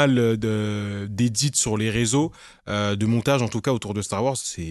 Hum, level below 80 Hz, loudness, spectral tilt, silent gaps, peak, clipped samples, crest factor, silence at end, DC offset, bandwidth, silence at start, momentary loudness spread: none; -48 dBFS; -23 LUFS; -4.5 dB/octave; none; -4 dBFS; under 0.1%; 20 dB; 0 s; under 0.1%; 12.5 kHz; 0 s; 8 LU